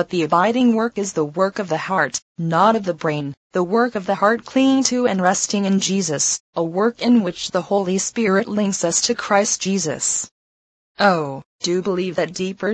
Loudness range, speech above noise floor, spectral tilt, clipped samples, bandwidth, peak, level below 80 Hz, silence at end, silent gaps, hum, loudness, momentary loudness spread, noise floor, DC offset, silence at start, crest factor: 2 LU; over 71 dB; -4 dB/octave; under 0.1%; 9.2 kHz; 0 dBFS; -62 dBFS; 0 s; 2.22-2.35 s, 3.37-3.50 s, 6.40-6.53 s, 10.31-10.95 s, 11.45-11.59 s; none; -19 LUFS; 7 LU; under -90 dBFS; under 0.1%; 0 s; 18 dB